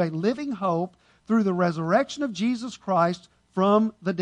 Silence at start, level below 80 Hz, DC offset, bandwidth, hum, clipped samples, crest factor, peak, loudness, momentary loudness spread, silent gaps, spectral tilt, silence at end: 0 s; -66 dBFS; under 0.1%; 9.8 kHz; none; under 0.1%; 16 dB; -8 dBFS; -25 LUFS; 8 LU; none; -7 dB/octave; 0 s